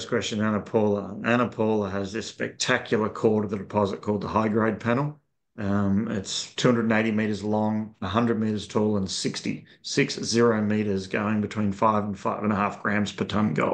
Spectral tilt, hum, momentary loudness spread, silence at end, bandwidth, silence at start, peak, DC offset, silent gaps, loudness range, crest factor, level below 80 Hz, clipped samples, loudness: -5.5 dB/octave; none; 6 LU; 0 s; 9.4 kHz; 0 s; -6 dBFS; under 0.1%; none; 1 LU; 18 dB; -62 dBFS; under 0.1%; -25 LUFS